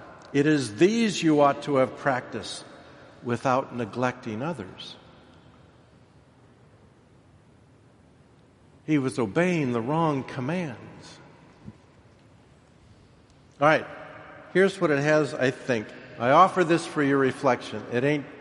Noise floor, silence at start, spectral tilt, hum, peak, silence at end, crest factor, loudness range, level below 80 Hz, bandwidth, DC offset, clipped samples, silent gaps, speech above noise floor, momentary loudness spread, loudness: -56 dBFS; 0 s; -6 dB/octave; none; -4 dBFS; 0 s; 22 dB; 12 LU; -66 dBFS; 11.5 kHz; under 0.1%; under 0.1%; none; 32 dB; 18 LU; -25 LUFS